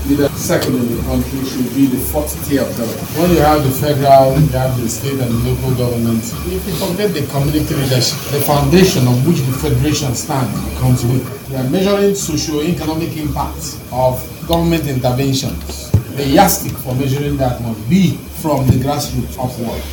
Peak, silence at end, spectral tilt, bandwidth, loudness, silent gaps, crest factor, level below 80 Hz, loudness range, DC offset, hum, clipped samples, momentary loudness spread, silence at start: 0 dBFS; 0 s; -5.5 dB/octave; 17.5 kHz; -15 LUFS; none; 14 dB; -30 dBFS; 4 LU; under 0.1%; none; 0.1%; 9 LU; 0 s